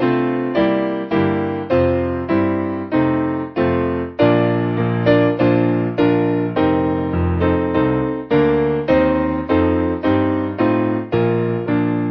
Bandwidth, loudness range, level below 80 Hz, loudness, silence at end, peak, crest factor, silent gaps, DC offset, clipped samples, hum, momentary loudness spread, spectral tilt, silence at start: 5.8 kHz; 2 LU; -34 dBFS; -17 LUFS; 0 s; -2 dBFS; 16 dB; none; under 0.1%; under 0.1%; none; 4 LU; -10 dB/octave; 0 s